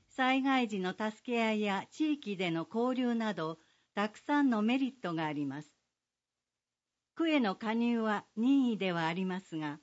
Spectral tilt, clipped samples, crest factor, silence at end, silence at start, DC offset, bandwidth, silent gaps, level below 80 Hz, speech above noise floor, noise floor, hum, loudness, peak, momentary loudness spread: -6 dB/octave; under 0.1%; 16 dB; 0.05 s; 0.2 s; under 0.1%; 8 kHz; none; -84 dBFS; over 58 dB; under -90 dBFS; 60 Hz at -60 dBFS; -33 LUFS; -18 dBFS; 9 LU